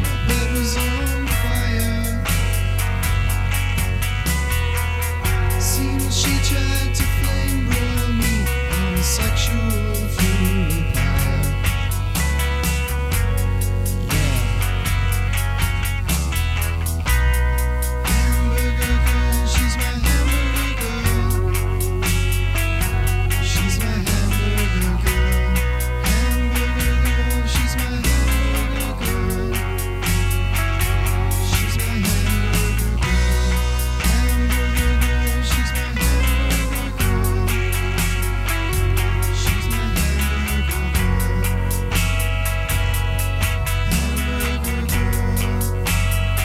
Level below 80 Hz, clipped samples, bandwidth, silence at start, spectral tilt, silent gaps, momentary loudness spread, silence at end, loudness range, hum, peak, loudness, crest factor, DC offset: -20 dBFS; under 0.1%; 16.5 kHz; 0 s; -4.5 dB/octave; none; 3 LU; 0 s; 1 LU; none; -4 dBFS; -20 LUFS; 14 dB; under 0.1%